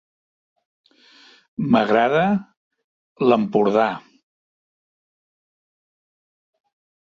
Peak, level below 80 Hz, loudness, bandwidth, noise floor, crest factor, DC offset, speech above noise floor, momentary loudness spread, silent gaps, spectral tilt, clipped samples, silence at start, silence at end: -2 dBFS; -66 dBFS; -19 LUFS; 7.2 kHz; -51 dBFS; 20 dB; under 0.1%; 34 dB; 11 LU; 2.57-2.71 s, 2.84-3.16 s; -7.5 dB/octave; under 0.1%; 1.6 s; 3.15 s